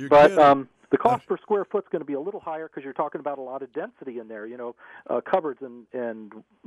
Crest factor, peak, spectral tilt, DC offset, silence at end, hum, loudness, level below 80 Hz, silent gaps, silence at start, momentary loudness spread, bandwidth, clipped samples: 18 dB; -6 dBFS; -6.5 dB/octave; under 0.1%; 0.25 s; none; -24 LUFS; -60 dBFS; none; 0 s; 20 LU; 11.5 kHz; under 0.1%